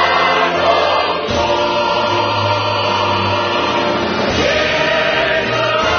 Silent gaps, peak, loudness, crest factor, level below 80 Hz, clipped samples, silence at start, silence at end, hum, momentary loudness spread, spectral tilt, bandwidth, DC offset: none; -2 dBFS; -14 LUFS; 14 dB; -40 dBFS; under 0.1%; 0 s; 0 s; none; 3 LU; -2 dB/octave; 6.6 kHz; under 0.1%